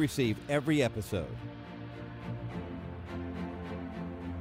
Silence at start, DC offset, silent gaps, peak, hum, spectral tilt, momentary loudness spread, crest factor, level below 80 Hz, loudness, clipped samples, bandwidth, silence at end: 0 s; under 0.1%; none; -16 dBFS; none; -6 dB/octave; 14 LU; 18 dB; -52 dBFS; -36 LUFS; under 0.1%; 16 kHz; 0 s